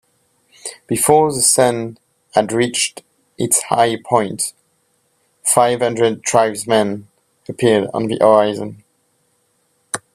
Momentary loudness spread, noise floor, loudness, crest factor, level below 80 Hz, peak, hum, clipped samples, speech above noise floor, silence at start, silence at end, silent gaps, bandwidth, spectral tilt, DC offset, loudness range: 15 LU; -63 dBFS; -16 LUFS; 18 dB; -58 dBFS; 0 dBFS; none; under 0.1%; 47 dB; 0.65 s; 0.15 s; none; 16 kHz; -3.5 dB/octave; under 0.1%; 3 LU